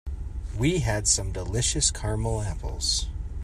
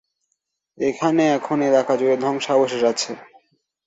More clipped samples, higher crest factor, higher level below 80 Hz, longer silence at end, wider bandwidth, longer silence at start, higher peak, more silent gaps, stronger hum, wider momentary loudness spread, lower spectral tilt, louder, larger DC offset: neither; about the same, 20 dB vs 16 dB; first, -34 dBFS vs -66 dBFS; second, 0 s vs 0.65 s; first, 13.5 kHz vs 8 kHz; second, 0.05 s vs 0.8 s; second, -8 dBFS vs -4 dBFS; neither; neither; first, 13 LU vs 8 LU; about the same, -3.5 dB/octave vs -4.5 dB/octave; second, -26 LUFS vs -20 LUFS; neither